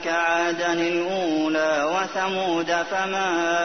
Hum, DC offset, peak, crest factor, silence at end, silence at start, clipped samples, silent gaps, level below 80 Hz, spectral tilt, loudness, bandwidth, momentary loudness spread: none; 0.3%; -8 dBFS; 14 dB; 0 s; 0 s; under 0.1%; none; -66 dBFS; -3.5 dB/octave; -23 LUFS; 6.6 kHz; 2 LU